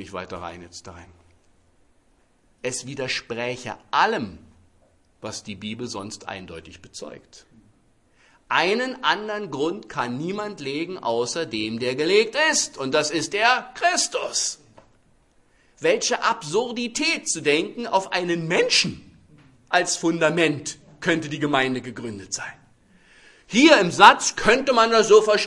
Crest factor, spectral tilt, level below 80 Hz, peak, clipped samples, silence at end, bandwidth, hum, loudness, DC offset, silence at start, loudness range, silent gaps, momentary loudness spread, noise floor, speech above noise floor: 24 dB; -3 dB/octave; -58 dBFS; 0 dBFS; under 0.1%; 0 s; 12 kHz; none; -21 LUFS; under 0.1%; 0 s; 13 LU; none; 18 LU; -62 dBFS; 40 dB